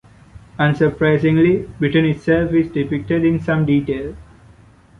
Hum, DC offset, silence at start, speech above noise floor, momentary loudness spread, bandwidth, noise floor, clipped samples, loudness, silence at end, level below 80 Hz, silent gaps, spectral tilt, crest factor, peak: none; under 0.1%; 0.35 s; 30 dB; 8 LU; 6.6 kHz; -47 dBFS; under 0.1%; -17 LUFS; 0.75 s; -42 dBFS; none; -9 dB/octave; 14 dB; -4 dBFS